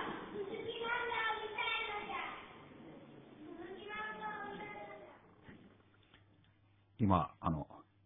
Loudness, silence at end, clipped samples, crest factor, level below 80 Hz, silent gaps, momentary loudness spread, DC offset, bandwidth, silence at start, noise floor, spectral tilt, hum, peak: -40 LUFS; 0.25 s; under 0.1%; 26 dB; -64 dBFS; none; 22 LU; under 0.1%; 3.9 kHz; 0 s; -69 dBFS; -3.5 dB/octave; none; -16 dBFS